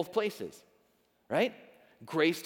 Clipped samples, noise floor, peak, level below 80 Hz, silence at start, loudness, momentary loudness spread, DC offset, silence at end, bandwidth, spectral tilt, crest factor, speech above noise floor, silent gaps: under 0.1%; -71 dBFS; -12 dBFS; -82 dBFS; 0 s; -33 LUFS; 13 LU; under 0.1%; 0 s; 20 kHz; -5 dB/octave; 20 dB; 39 dB; none